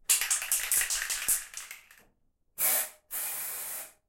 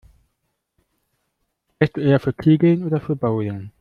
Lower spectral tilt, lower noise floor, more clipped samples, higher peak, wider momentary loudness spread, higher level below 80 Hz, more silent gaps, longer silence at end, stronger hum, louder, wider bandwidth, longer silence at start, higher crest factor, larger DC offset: second, 3 dB/octave vs -10 dB/octave; second, -70 dBFS vs -74 dBFS; neither; second, -6 dBFS vs -2 dBFS; first, 17 LU vs 7 LU; second, -60 dBFS vs -54 dBFS; neither; about the same, 0.2 s vs 0.1 s; neither; second, -28 LUFS vs -19 LUFS; first, 17 kHz vs 5.4 kHz; second, 0.1 s vs 1.8 s; first, 28 dB vs 18 dB; neither